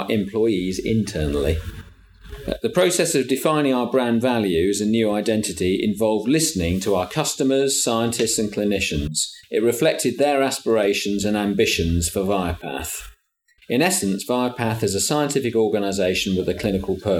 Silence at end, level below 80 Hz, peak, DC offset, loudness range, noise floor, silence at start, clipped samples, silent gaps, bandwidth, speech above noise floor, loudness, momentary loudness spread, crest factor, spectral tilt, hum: 0 s; -40 dBFS; -4 dBFS; under 0.1%; 2 LU; -60 dBFS; 0 s; under 0.1%; none; 18.5 kHz; 40 dB; -21 LUFS; 5 LU; 16 dB; -4 dB/octave; none